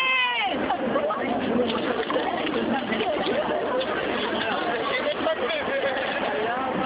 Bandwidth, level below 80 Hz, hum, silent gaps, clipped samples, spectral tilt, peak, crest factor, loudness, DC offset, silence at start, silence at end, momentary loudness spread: 4 kHz; -56 dBFS; none; none; under 0.1%; -8 dB/octave; -10 dBFS; 14 dB; -25 LUFS; under 0.1%; 0 s; 0 s; 2 LU